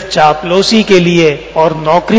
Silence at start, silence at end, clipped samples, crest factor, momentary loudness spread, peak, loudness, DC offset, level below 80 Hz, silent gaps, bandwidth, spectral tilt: 0 s; 0 s; 1%; 10 dB; 5 LU; 0 dBFS; -9 LUFS; under 0.1%; -38 dBFS; none; 8 kHz; -5 dB/octave